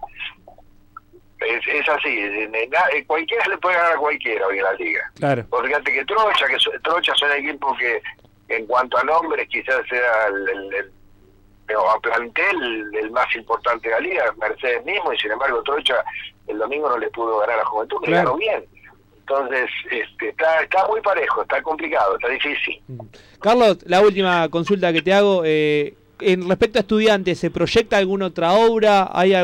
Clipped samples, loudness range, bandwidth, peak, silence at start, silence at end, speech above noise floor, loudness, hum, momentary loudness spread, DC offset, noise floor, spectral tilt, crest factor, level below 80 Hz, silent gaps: under 0.1%; 4 LU; 16 kHz; -6 dBFS; 0 s; 0 s; 32 dB; -19 LUFS; none; 9 LU; under 0.1%; -51 dBFS; -5 dB/octave; 14 dB; -52 dBFS; none